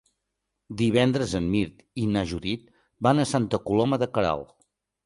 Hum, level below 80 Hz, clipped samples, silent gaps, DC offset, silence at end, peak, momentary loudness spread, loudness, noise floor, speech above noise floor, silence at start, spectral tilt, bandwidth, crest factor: none; -48 dBFS; under 0.1%; none; under 0.1%; 0.6 s; -6 dBFS; 10 LU; -25 LUFS; -81 dBFS; 57 dB; 0.7 s; -6 dB/octave; 11.5 kHz; 20 dB